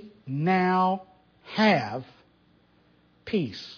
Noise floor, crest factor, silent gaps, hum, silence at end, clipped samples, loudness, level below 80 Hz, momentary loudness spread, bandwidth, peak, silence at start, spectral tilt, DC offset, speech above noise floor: -62 dBFS; 18 dB; none; 60 Hz at -55 dBFS; 0 s; under 0.1%; -26 LUFS; -66 dBFS; 13 LU; 5.4 kHz; -10 dBFS; 0 s; -7 dB/octave; under 0.1%; 37 dB